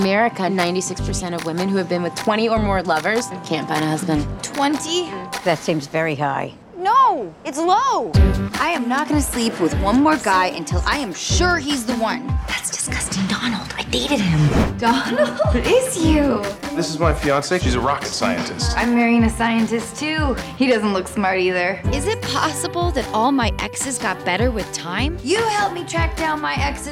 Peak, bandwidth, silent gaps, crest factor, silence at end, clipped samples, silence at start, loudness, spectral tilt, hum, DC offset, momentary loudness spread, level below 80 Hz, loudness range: -4 dBFS; 16.5 kHz; none; 16 dB; 0 s; under 0.1%; 0 s; -19 LUFS; -4.5 dB/octave; none; under 0.1%; 6 LU; -30 dBFS; 3 LU